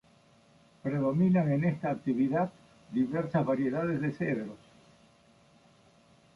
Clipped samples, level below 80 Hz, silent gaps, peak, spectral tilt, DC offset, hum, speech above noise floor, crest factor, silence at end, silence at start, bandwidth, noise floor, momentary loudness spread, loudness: under 0.1%; -68 dBFS; none; -16 dBFS; -9.5 dB/octave; under 0.1%; none; 33 dB; 14 dB; 1.8 s; 0.85 s; 11 kHz; -62 dBFS; 10 LU; -30 LUFS